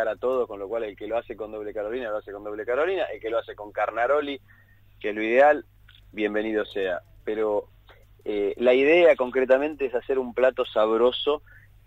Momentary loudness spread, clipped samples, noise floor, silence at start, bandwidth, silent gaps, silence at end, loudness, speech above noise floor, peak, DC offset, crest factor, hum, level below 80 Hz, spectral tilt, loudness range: 14 LU; under 0.1%; -53 dBFS; 0 s; 7.8 kHz; none; 0.5 s; -25 LUFS; 29 dB; -6 dBFS; under 0.1%; 18 dB; none; -56 dBFS; -6 dB/octave; 7 LU